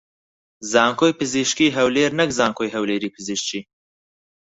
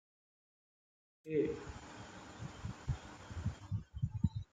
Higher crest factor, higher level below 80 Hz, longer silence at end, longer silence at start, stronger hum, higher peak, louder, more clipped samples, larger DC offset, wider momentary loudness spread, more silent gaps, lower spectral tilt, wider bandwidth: about the same, 20 dB vs 24 dB; about the same, -58 dBFS vs -54 dBFS; first, 0.85 s vs 0.1 s; second, 0.6 s vs 1.25 s; neither; first, -2 dBFS vs -18 dBFS; first, -20 LUFS vs -42 LUFS; neither; neither; second, 9 LU vs 15 LU; neither; second, -3.5 dB/octave vs -7.5 dB/octave; second, 8.2 kHz vs 9.4 kHz